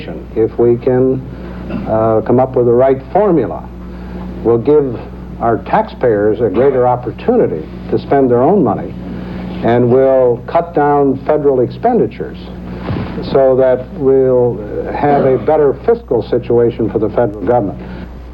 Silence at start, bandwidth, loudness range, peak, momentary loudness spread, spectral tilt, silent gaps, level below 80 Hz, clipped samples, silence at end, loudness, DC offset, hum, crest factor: 0 s; 5.4 kHz; 2 LU; 0 dBFS; 15 LU; -10.5 dB/octave; none; -34 dBFS; under 0.1%; 0 s; -13 LUFS; under 0.1%; none; 12 dB